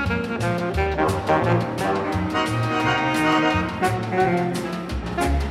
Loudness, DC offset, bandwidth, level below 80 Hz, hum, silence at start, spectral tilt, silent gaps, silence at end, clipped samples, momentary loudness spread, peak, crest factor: -22 LUFS; under 0.1%; 15.5 kHz; -34 dBFS; none; 0 s; -6 dB/octave; none; 0 s; under 0.1%; 5 LU; -6 dBFS; 16 dB